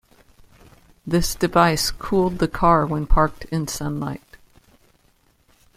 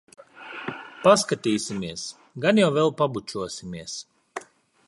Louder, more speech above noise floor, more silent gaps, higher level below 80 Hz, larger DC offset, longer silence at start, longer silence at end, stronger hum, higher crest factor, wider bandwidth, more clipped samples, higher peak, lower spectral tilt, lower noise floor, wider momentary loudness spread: first, -21 LUFS vs -24 LUFS; first, 41 dB vs 21 dB; neither; first, -32 dBFS vs -62 dBFS; neither; first, 1.05 s vs 0.35 s; first, 1.6 s vs 0.45 s; neither; about the same, 20 dB vs 22 dB; first, 16 kHz vs 11.5 kHz; neither; about the same, -2 dBFS vs -2 dBFS; about the same, -5 dB/octave vs -4.5 dB/octave; first, -60 dBFS vs -44 dBFS; second, 11 LU vs 20 LU